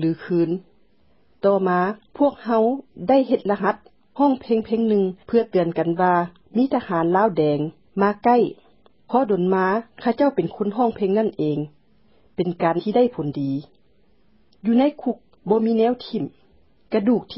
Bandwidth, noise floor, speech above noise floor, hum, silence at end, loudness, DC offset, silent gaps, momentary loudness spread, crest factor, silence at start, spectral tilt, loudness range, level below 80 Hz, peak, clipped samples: 5.8 kHz; -62 dBFS; 41 dB; none; 0 s; -21 LUFS; 0.1%; none; 9 LU; 16 dB; 0 s; -12 dB/octave; 3 LU; -62 dBFS; -4 dBFS; under 0.1%